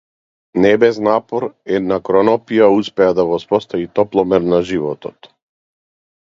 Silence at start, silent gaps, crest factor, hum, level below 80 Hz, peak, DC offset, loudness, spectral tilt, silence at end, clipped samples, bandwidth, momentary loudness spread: 0.55 s; none; 16 dB; none; -52 dBFS; 0 dBFS; under 0.1%; -15 LUFS; -7 dB/octave; 1.35 s; under 0.1%; 7.6 kHz; 10 LU